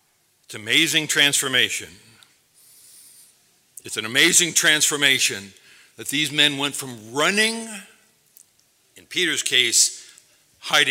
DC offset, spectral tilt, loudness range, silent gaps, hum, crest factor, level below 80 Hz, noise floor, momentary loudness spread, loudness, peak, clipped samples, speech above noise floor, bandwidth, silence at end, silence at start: under 0.1%; -0.5 dB/octave; 4 LU; none; none; 22 dB; -74 dBFS; -62 dBFS; 19 LU; -18 LUFS; 0 dBFS; under 0.1%; 41 dB; 18.5 kHz; 0 s; 0.5 s